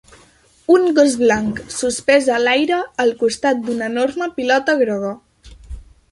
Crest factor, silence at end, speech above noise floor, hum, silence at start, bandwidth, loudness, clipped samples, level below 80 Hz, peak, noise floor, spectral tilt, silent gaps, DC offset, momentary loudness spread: 16 dB; 0.3 s; 35 dB; none; 0.7 s; 11.5 kHz; -17 LUFS; under 0.1%; -46 dBFS; -2 dBFS; -52 dBFS; -3.5 dB/octave; none; under 0.1%; 9 LU